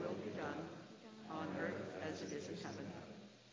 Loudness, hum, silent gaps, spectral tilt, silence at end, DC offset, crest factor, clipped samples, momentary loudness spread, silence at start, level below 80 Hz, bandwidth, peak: -47 LUFS; none; none; -5.5 dB/octave; 0 s; under 0.1%; 18 dB; under 0.1%; 13 LU; 0 s; -74 dBFS; 7.6 kHz; -30 dBFS